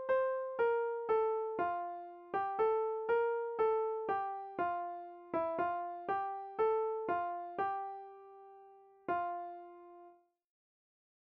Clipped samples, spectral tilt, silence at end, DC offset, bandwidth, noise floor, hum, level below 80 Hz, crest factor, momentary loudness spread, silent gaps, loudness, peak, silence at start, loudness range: under 0.1%; -3.5 dB/octave; 1.15 s; under 0.1%; 4.6 kHz; -62 dBFS; none; -78 dBFS; 14 dB; 16 LU; none; -36 LUFS; -22 dBFS; 0 s; 8 LU